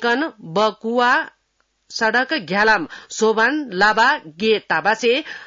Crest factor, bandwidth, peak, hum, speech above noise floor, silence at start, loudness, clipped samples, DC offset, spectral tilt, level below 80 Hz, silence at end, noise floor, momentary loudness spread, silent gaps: 14 dB; 7.8 kHz; -4 dBFS; none; 49 dB; 0 s; -18 LUFS; under 0.1%; under 0.1%; -3.5 dB/octave; -60 dBFS; 0 s; -67 dBFS; 6 LU; none